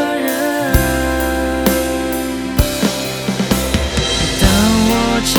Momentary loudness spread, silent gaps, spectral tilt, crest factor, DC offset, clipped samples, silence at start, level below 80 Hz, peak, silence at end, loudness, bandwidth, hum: 7 LU; none; -4 dB/octave; 16 dB; under 0.1%; under 0.1%; 0 s; -24 dBFS; 0 dBFS; 0 s; -15 LUFS; over 20 kHz; none